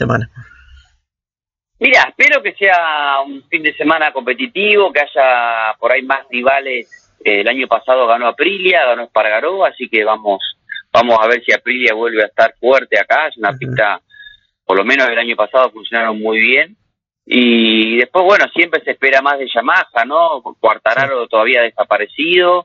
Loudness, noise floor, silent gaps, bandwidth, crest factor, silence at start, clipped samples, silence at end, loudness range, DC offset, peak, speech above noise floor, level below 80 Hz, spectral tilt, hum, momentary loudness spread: -13 LUFS; -90 dBFS; none; 7.4 kHz; 14 dB; 0 s; under 0.1%; 0.05 s; 2 LU; under 0.1%; 0 dBFS; 77 dB; -56 dBFS; -5 dB/octave; none; 7 LU